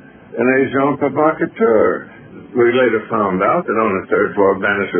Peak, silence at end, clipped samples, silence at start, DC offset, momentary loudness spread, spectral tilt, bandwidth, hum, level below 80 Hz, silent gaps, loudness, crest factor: 0 dBFS; 0 s; under 0.1%; 0.3 s; under 0.1%; 5 LU; -1.5 dB/octave; 3.5 kHz; none; -54 dBFS; none; -16 LUFS; 16 dB